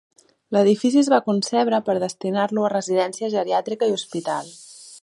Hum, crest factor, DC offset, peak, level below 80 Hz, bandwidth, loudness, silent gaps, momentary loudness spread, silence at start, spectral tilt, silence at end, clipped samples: none; 18 dB; under 0.1%; -4 dBFS; -76 dBFS; 11.5 kHz; -21 LUFS; none; 10 LU; 0.5 s; -5 dB/octave; 0.05 s; under 0.1%